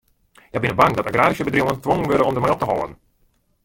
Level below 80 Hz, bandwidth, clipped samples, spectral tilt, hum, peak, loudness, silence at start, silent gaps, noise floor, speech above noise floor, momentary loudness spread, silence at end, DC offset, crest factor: -46 dBFS; 17 kHz; under 0.1%; -6.5 dB/octave; none; -2 dBFS; -19 LUFS; 0.55 s; none; -63 dBFS; 44 dB; 8 LU; 0.7 s; under 0.1%; 18 dB